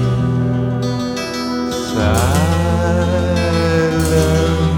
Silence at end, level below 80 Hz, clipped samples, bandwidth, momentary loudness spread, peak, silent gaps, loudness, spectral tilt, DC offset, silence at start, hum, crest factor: 0 s; -28 dBFS; under 0.1%; 17 kHz; 6 LU; -2 dBFS; none; -16 LUFS; -6 dB/octave; under 0.1%; 0 s; none; 14 dB